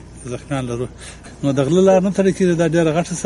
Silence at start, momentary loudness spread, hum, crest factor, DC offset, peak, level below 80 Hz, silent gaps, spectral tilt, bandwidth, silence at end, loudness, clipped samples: 0.05 s; 17 LU; none; 16 dB; under 0.1%; -2 dBFS; -44 dBFS; none; -6.5 dB/octave; 11.5 kHz; 0 s; -17 LUFS; under 0.1%